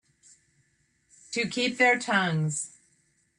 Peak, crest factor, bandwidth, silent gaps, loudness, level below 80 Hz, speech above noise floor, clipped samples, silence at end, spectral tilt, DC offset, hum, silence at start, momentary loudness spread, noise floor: -10 dBFS; 20 dB; 11 kHz; none; -26 LUFS; -72 dBFS; 44 dB; under 0.1%; 0.7 s; -4 dB/octave; under 0.1%; none; 1.3 s; 12 LU; -70 dBFS